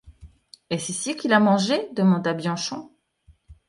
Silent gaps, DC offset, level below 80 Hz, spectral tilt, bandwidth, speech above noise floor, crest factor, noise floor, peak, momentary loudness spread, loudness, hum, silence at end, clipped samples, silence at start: none; under 0.1%; -56 dBFS; -5 dB/octave; 11.5 kHz; 36 dB; 22 dB; -58 dBFS; -2 dBFS; 12 LU; -22 LUFS; none; 0.15 s; under 0.1%; 0.05 s